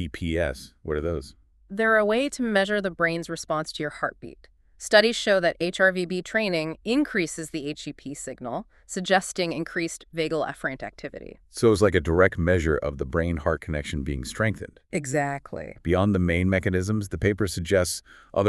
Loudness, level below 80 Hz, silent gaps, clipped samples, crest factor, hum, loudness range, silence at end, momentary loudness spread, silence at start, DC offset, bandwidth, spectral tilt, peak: -25 LUFS; -42 dBFS; none; under 0.1%; 22 dB; none; 5 LU; 0 s; 15 LU; 0 s; under 0.1%; 13.5 kHz; -5 dB/octave; -2 dBFS